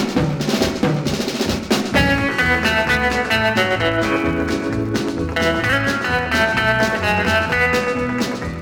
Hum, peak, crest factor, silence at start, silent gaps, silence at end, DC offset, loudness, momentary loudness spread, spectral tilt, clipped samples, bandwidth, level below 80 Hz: none; -4 dBFS; 14 dB; 0 s; none; 0 s; under 0.1%; -18 LUFS; 5 LU; -4.5 dB/octave; under 0.1%; over 20 kHz; -36 dBFS